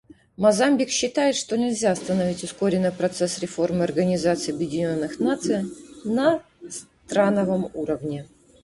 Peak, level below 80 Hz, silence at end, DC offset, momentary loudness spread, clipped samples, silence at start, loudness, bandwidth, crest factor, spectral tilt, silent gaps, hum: -6 dBFS; -58 dBFS; 0.4 s; under 0.1%; 8 LU; under 0.1%; 0.4 s; -23 LUFS; 11.5 kHz; 18 dB; -5 dB/octave; none; none